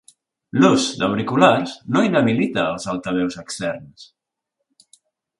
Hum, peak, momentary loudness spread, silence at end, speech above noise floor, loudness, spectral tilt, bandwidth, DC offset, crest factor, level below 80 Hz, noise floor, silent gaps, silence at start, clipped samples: none; 0 dBFS; 11 LU; 1.35 s; 60 dB; -19 LUFS; -5 dB/octave; 11.5 kHz; under 0.1%; 20 dB; -58 dBFS; -79 dBFS; none; 0.55 s; under 0.1%